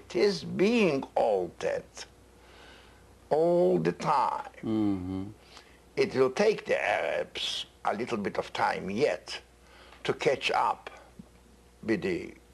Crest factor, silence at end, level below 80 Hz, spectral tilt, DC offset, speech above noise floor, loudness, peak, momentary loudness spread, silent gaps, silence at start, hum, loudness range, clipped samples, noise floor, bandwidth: 18 dB; 0.2 s; -60 dBFS; -5 dB/octave; under 0.1%; 29 dB; -29 LUFS; -12 dBFS; 13 LU; none; 0.1 s; none; 3 LU; under 0.1%; -57 dBFS; 12.5 kHz